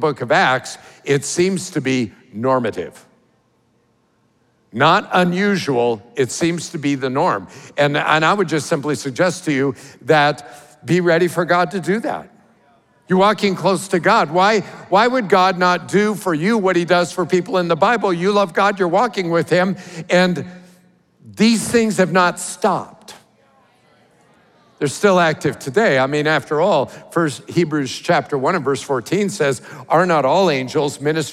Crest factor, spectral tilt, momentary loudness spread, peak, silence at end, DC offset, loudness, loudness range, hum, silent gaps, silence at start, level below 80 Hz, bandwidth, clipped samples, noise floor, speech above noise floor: 16 dB; -5 dB/octave; 8 LU; -2 dBFS; 0 s; under 0.1%; -17 LUFS; 5 LU; none; none; 0 s; -64 dBFS; 15 kHz; under 0.1%; -61 dBFS; 44 dB